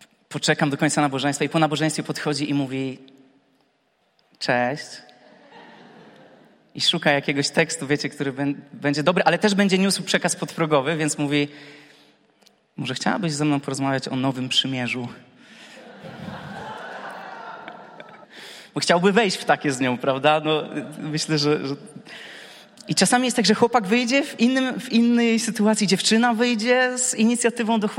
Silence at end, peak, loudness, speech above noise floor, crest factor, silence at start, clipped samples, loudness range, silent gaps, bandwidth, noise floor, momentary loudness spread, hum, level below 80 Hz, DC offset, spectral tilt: 0 s; -2 dBFS; -21 LUFS; 45 dB; 20 dB; 0.3 s; under 0.1%; 10 LU; none; 16 kHz; -66 dBFS; 19 LU; none; -68 dBFS; under 0.1%; -4 dB/octave